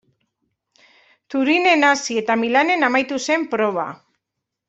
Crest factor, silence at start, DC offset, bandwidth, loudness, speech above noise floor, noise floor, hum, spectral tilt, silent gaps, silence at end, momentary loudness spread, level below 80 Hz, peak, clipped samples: 18 dB; 1.3 s; under 0.1%; 8.2 kHz; -18 LUFS; 63 dB; -81 dBFS; none; -3 dB/octave; none; 0.75 s; 8 LU; -68 dBFS; -2 dBFS; under 0.1%